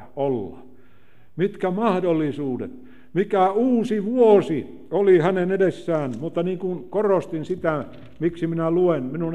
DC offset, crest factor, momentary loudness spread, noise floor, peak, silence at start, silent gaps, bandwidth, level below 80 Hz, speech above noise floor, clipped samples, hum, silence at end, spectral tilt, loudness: 0.8%; 18 dB; 12 LU; -57 dBFS; -4 dBFS; 0 s; none; 9.6 kHz; -60 dBFS; 35 dB; under 0.1%; none; 0 s; -8.5 dB/octave; -22 LUFS